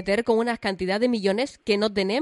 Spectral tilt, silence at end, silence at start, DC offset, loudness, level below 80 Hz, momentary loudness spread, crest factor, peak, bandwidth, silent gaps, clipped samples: -5 dB/octave; 0 s; 0 s; under 0.1%; -24 LUFS; -56 dBFS; 4 LU; 14 dB; -8 dBFS; 11.5 kHz; none; under 0.1%